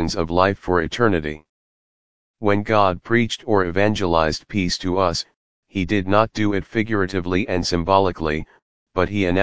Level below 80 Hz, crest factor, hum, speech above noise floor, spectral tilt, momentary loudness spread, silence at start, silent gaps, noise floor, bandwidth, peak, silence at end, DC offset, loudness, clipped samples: -38 dBFS; 20 dB; none; over 70 dB; -5.5 dB/octave; 7 LU; 0 s; 1.49-2.34 s, 5.36-5.63 s, 8.62-8.86 s; under -90 dBFS; 8 kHz; 0 dBFS; 0 s; 1%; -20 LUFS; under 0.1%